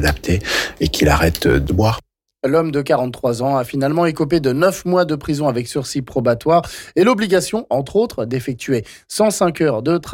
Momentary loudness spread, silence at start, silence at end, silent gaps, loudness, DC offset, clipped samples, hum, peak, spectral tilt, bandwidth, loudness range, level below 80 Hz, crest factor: 7 LU; 0 s; 0 s; none; -18 LUFS; under 0.1%; under 0.1%; none; -4 dBFS; -5.5 dB/octave; 17 kHz; 1 LU; -34 dBFS; 12 dB